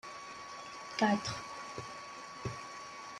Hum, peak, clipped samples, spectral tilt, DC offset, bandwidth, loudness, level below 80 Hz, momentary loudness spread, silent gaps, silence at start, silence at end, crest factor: none; -18 dBFS; under 0.1%; -4.5 dB/octave; under 0.1%; 12 kHz; -39 LUFS; -68 dBFS; 14 LU; none; 0.05 s; 0 s; 22 dB